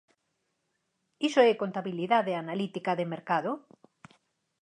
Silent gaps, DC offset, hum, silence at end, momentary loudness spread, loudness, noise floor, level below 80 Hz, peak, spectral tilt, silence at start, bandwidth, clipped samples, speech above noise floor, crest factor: none; under 0.1%; none; 1.05 s; 10 LU; -29 LUFS; -79 dBFS; -84 dBFS; -8 dBFS; -5.5 dB/octave; 1.2 s; 10 kHz; under 0.1%; 51 dB; 22 dB